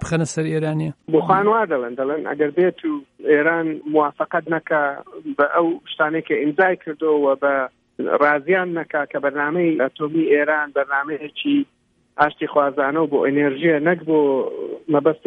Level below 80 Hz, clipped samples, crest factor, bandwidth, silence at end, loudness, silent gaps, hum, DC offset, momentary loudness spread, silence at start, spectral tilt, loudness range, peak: -60 dBFS; under 0.1%; 18 dB; 10.5 kHz; 0.1 s; -20 LUFS; none; none; under 0.1%; 7 LU; 0 s; -6.5 dB/octave; 1 LU; -2 dBFS